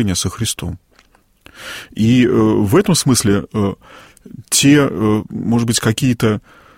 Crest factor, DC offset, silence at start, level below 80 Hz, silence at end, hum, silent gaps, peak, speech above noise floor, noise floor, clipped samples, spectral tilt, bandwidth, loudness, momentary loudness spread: 14 dB; under 0.1%; 0 s; -42 dBFS; 0.4 s; none; none; -2 dBFS; 38 dB; -53 dBFS; under 0.1%; -4.5 dB/octave; 16.5 kHz; -15 LUFS; 16 LU